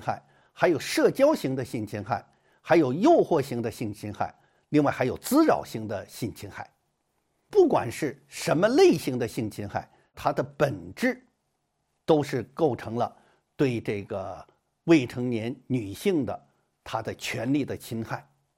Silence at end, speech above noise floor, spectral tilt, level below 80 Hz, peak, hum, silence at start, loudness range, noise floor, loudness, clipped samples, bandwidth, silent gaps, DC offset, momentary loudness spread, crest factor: 0.35 s; 51 dB; -6 dB/octave; -62 dBFS; -8 dBFS; none; 0 s; 5 LU; -76 dBFS; -26 LUFS; under 0.1%; 16.5 kHz; none; under 0.1%; 14 LU; 20 dB